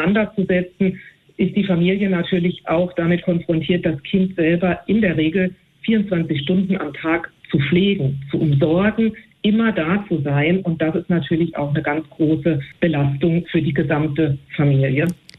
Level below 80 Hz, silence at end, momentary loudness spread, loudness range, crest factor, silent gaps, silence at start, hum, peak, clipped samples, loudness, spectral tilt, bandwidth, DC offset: -48 dBFS; 0.25 s; 5 LU; 1 LU; 14 dB; none; 0 s; none; -6 dBFS; under 0.1%; -19 LUFS; -9 dB/octave; 9.2 kHz; under 0.1%